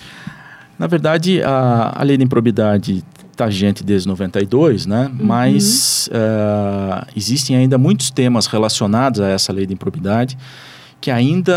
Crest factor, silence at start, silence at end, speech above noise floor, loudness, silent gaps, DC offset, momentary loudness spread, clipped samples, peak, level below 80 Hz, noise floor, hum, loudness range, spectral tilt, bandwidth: 14 dB; 0 s; 0 s; 24 dB; -15 LUFS; none; under 0.1%; 9 LU; under 0.1%; -2 dBFS; -54 dBFS; -39 dBFS; none; 2 LU; -5 dB/octave; 16 kHz